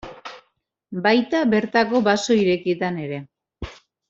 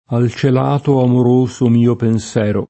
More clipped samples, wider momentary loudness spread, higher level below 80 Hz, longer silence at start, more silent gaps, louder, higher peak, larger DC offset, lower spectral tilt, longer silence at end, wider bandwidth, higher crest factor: neither; first, 19 LU vs 4 LU; about the same, -50 dBFS vs -50 dBFS; about the same, 0.05 s vs 0.1 s; neither; second, -20 LUFS vs -14 LUFS; second, -4 dBFS vs 0 dBFS; neither; second, -5 dB/octave vs -8 dB/octave; first, 0.35 s vs 0.05 s; second, 7.8 kHz vs 8.6 kHz; first, 18 dB vs 12 dB